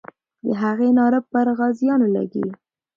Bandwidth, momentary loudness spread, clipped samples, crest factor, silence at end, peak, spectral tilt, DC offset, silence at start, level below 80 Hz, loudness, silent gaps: 4.7 kHz; 10 LU; under 0.1%; 12 dB; 0.4 s; -6 dBFS; -9 dB/octave; under 0.1%; 0.45 s; -66 dBFS; -20 LUFS; none